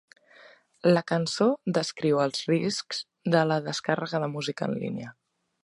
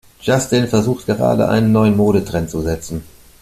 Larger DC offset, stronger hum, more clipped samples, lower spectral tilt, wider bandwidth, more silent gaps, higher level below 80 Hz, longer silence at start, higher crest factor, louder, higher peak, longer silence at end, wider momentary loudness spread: neither; neither; neither; about the same, -5.5 dB/octave vs -6 dB/octave; second, 11.5 kHz vs 14.5 kHz; neither; second, -72 dBFS vs -40 dBFS; first, 0.85 s vs 0.25 s; first, 20 dB vs 14 dB; second, -27 LUFS vs -16 LUFS; second, -8 dBFS vs -2 dBFS; first, 0.55 s vs 0.4 s; about the same, 8 LU vs 9 LU